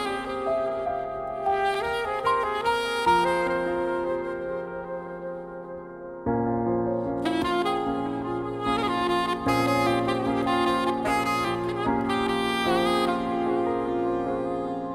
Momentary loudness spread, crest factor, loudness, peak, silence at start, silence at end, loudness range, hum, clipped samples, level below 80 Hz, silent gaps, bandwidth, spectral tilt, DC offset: 10 LU; 16 dB; -26 LUFS; -10 dBFS; 0 s; 0 s; 5 LU; none; under 0.1%; -50 dBFS; none; 16 kHz; -5.5 dB/octave; under 0.1%